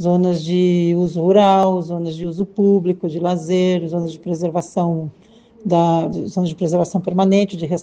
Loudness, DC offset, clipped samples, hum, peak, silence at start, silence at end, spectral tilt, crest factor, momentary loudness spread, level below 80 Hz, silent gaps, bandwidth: -18 LUFS; under 0.1%; under 0.1%; none; 0 dBFS; 0 s; 0 s; -7.5 dB/octave; 16 dB; 10 LU; -56 dBFS; none; 8.8 kHz